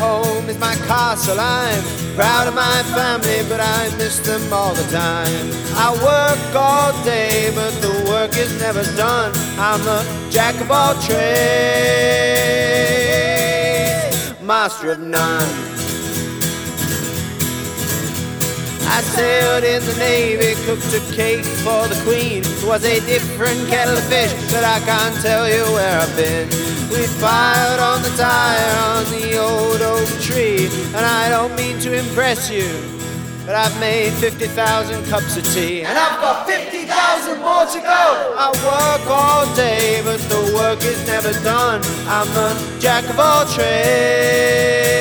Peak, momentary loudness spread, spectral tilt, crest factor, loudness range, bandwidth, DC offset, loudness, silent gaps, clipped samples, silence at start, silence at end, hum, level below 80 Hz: -2 dBFS; 6 LU; -3.5 dB/octave; 16 dB; 3 LU; over 20 kHz; under 0.1%; -16 LUFS; none; under 0.1%; 0 s; 0 s; none; -44 dBFS